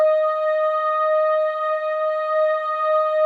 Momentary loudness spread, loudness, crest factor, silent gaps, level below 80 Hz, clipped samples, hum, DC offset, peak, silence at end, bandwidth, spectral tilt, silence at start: 4 LU; -20 LUFS; 10 dB; none; under -90 dBFS; under 0.1%; none; under 0.1%; -10 dBFS; 0 s; 4.6 kHz; 0.5 dB/octave; 0 s